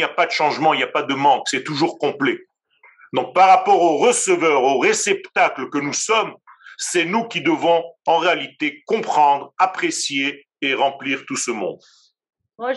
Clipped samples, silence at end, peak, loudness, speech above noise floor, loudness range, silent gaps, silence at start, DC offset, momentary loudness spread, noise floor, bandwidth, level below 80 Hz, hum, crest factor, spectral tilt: under 0.1%; 0 s; 0 dBFS; -18 LUFS; 36 dB; 4 LU; none; 0 s; under 0.1%; 9 LU; -54 dBFS; 12 kHz; -84 dBFS; none; 18 dB; -2.5 dB/octave